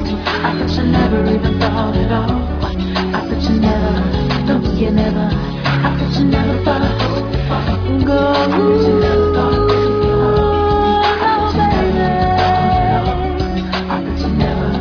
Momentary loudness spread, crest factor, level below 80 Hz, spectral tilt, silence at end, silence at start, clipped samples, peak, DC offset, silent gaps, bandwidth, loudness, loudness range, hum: 5 LU; 14 dB; -24 dBFS; -8 dB/octave; 0 s; 0 s; under 0.1%; 0 dBFS; under 0.1%; none; 5.4 kHz; -15 LUFS; 3 LU; none